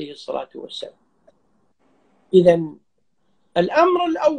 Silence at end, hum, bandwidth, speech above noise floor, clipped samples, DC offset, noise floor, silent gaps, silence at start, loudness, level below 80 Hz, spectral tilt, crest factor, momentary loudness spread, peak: 0 s; none; 9.4 kHz; 52 dB; under 0.1%; under 0.1%; -70 dBFS; none; 0 s; -18 LUFS; -60 dBFS; -7 dB/octave; 20 dB; 18 LU; -2 dBFS